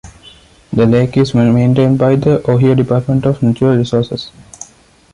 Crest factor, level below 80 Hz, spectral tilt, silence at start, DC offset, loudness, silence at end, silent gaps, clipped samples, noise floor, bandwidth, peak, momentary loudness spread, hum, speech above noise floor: 12 dB; -42 dBFS; -8 dB/octave; 0.05 s; under 0.1%; -12 LUFS; 0.5 s; none; under 0.1%; -45 dBFS; 10.5 kHz; 0 dBFS; 19 LU; none; 34 dB